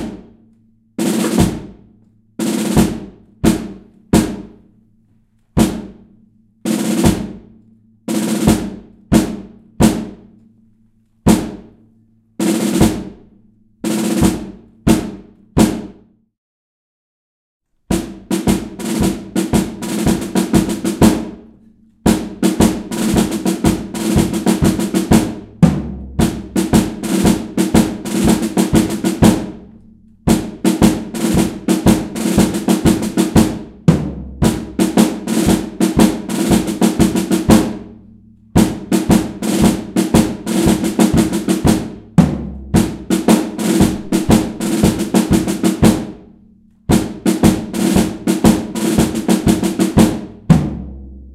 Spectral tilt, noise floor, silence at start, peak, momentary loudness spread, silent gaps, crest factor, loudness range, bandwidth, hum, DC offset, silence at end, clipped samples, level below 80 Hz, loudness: -5.5 dB/octave; -55 dBFS; 0 s; 0 dBFS; 10 LU; 16.38-17.60 s; 16 dB; 5 LU; 16.5 kHz; none; under 0.1%; 0 s; under 0.1%; -32 dBFS; -15 LUFS